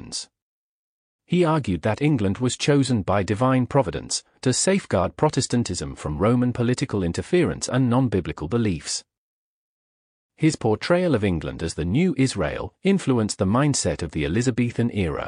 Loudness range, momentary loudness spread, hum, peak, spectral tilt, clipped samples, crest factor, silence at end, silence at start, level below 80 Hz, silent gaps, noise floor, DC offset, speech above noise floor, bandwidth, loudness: 3 LU; 7 LU; none; -8 dBFS; -5.5 dB/octave; under 0.1%; 16 dB; 0 s; 0 s; -44 dBFS; 0.42-1.19 s, 9.18-10.29 s; under -90 dBFS; under 0.1%; over 68 dB; 10.5 kHz; -23 LUFS